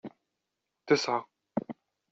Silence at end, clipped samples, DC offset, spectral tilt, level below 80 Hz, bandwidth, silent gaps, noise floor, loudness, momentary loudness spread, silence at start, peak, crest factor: 0.4 s; under 0.1%; under 0.1%; -3 dB/octave; -74 dBFS; 7.6 kHz; none; -85 dBFS; -31 LUFS; 21 LU; 0.05 s; -10 dBFS; 24 dB